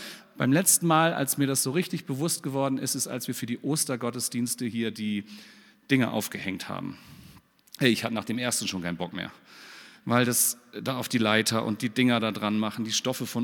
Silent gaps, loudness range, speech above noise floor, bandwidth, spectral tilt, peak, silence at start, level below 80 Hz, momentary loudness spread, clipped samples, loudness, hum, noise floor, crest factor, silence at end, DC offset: none; 5 LU; 27 dB; 19 kHz; -3.5 dB/octave; -6 dBFS; 0 s; -72 dBFS; 13 LU; under 0.1%; -26 LUFS; none; -54 dBFS; 22 dB; 0 s; under 0.1%